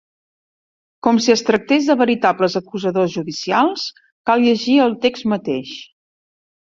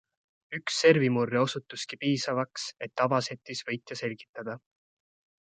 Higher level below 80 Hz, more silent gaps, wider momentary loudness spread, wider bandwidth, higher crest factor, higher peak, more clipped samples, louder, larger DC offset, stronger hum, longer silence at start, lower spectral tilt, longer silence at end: first, -60 dBFS vs -74 dBFS; first, 4.12-4.24 s vs 4.29-4.34 s; second, 11 LU vs 17 LU; second, 7.6 kHz vs 9.4 kHz; second, 16 dB vs 22 dB; first, -2 dBFS vs -8 dBFS; neither; first, -17 LUFS vs -29 LUFS; neither; neither; first, 1.05 s vs 0.5 s; about the same, -4.5 dB/octave vs -4.5 dB/octave; about the same, 0.85 s vs 0.85 s